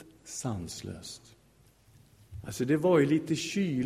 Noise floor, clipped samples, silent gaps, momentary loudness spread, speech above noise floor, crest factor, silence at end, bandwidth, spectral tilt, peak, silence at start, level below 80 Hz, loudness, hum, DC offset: -62 dBFS; under 0.1%; none; 21 LU; 33 dB; 20 dB; 0 s; 16 kHz; -5.5 dB/octave; -12 dBFS; 0 s; -60 dBFS; -30 LUFS; none; under 0.1%